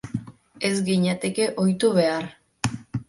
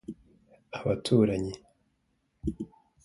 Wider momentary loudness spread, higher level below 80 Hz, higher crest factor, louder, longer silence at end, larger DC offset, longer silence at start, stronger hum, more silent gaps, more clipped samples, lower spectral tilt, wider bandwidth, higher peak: second, 12 LU vs 22 LU; about the same, -56 dBFS vs -52 dBFS; about the same, 20 dB vs 22 dB; first, -24 LUFS vs -29 LUFS; second, 0.05 s vs 0.4 s; neither; about the same, 0.05 s vs 0.1 s; neither; neither; neither; second, -5.5 dB/octave vs -7 dB/octave; about the same, 11.5 kHz vs 11.5 kHz; first, -4 dBFS vs -10 dBFS